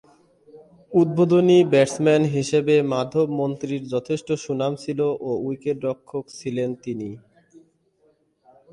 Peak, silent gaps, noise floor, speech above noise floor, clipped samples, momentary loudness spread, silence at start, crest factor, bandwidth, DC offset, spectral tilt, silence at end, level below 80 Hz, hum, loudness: -6 dBFS; none; -63 dBFS; 42 dB; under 0.1%; 14 LU; 0.55 s; 16 dB; 11.5 kHz; under 0.1%; -6.5 dB/octave; 1.55 s; -64 dBFS; none; -22 LUFS